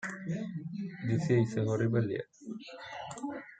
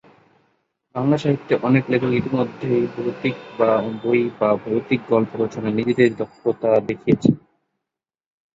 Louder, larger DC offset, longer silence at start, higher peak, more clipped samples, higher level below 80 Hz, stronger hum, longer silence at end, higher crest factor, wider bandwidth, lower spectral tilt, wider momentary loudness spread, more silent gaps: second, -33 LUFS vs -20 LUFS; neither; second, 0 s vs 0.95 s; second, -16 dBFS vs -2 dBFS; neither; second, -72 dBFS vs -58 dBFS; neither; second, 0.05 s vs 1.2 s; about the same, 18 dB vs 20 dB; first, 9 kHz vs 7.8 kHz; about the same, -7.5 dB/octave vs -8 dB/octave; first, 15 LU vs 6 LU; neither